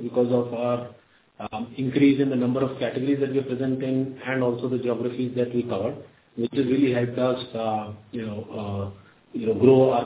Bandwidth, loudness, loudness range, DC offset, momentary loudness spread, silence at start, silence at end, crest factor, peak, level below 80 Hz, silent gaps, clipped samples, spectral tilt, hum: 4 kHz; -25 LUFS; 3 LU; under 0.1%; 14 LU; 0 s; 0 s; 20 dB; -4 dBFS; -58 dBFS; none; under 0.1%; -11.5 dB/octave; none